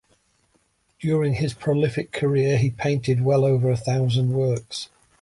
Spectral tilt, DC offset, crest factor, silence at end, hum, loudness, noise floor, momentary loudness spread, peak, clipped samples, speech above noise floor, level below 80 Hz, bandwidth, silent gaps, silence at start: -7 dB/octave; under 0.1%; 12 dB; 0.35 s; none; -22 LUFS; -66 dBFS; 9 LU; -10 dBFS; under 0.1%; 45 dB; -52 dBFS; 11.5 kHz; none; 1 s